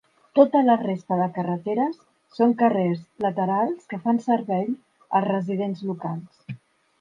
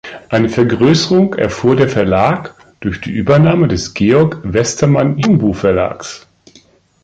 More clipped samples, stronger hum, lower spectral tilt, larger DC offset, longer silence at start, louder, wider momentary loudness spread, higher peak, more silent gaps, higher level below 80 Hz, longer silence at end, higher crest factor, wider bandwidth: neither; neither; first, -9 dB/octave vs -6 dB/octave; neither; first, 0.35 s vs 0.05 s; second, -23 LUFS vs -13 LUFS; first, 16 LU vs 11 LU; second, -4 dBFS vs 0 dBFS; neither; second, -72 dBFS vs -38 dBFS; second, 0.45 s vs 0.85 s; first, 20 dB vs 12 dB; second, 7.4 kHz vs 9.2 kHz